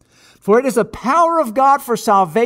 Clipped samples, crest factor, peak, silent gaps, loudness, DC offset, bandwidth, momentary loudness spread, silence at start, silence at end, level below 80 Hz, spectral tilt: under 0.1%; 12 dB; -2 dBFS; none; -15 LUFS; under 0.1%; 16 kHz; 5 LU; 0.45 s; 0 s; -52 dBFS; -5 dB/octave